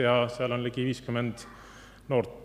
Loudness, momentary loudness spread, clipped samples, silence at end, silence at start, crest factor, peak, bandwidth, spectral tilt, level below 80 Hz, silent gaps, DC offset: -30 LUFS; 22 LU; under 0.1%; 0 s; 0 s; 20 dB; -10 dBFS; 13.5 kHz; -6.5 dB/octave; -58 dBFS; none; under 0.1%